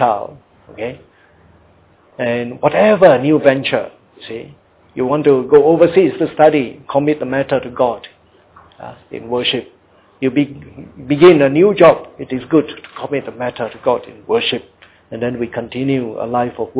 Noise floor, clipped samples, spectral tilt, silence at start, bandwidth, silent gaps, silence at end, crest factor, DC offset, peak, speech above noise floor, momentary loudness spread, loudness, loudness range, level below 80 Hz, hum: -50 dBFS; under 0.1%; -10.5 dB/octave; 0 s; 4 kHz; none; 0 s; 16 dB; under 0.1%; 0 dBFS; 36 dB; 20 LU; -14 LUFS; 7 LU; -52 dBFS; none